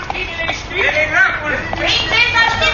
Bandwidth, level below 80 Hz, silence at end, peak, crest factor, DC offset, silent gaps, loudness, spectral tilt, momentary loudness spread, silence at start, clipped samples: 7.4 kHz; -34 dBFS; 0 s; 0 dBFS; 16 dB; under 0.1%; none; -14 LUFS; -3 dB/octave; 8 LU; 0 s; under 0.1%